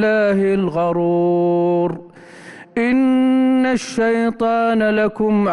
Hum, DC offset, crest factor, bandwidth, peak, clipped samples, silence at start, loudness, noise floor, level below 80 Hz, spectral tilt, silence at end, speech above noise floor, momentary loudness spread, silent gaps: none; under 0.1%; 8 dB; 11 kHz; -8 dBFS; under 0.1%; 0 s; -17 LUFS; -39 dBFS; -52 dBFS; -7 dB/octave; 0 s; 23 dB; 4 LU; none